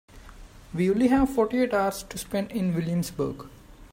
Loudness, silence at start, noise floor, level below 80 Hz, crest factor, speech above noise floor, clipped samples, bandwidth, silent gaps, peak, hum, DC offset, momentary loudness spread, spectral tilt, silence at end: -26 LUFS; 0.15 s; -46 dBFS; -46 dBFS; 16 dB; 21 dB; under 0.1%; 16 kHz; none; -10 dBFS; none; under 0.1%; 13 LU; -6.5 dB/octave; 0.05 s